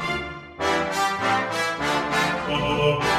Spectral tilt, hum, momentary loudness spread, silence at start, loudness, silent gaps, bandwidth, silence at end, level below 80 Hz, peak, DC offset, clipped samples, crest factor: -4 dB/octave; none; 6 LU; 0 s; -23 LUFS; none; 16 kHz; 0 s; -46 dBFS; -8 dBFS; under 0.1%; under 0.1%; 16 dB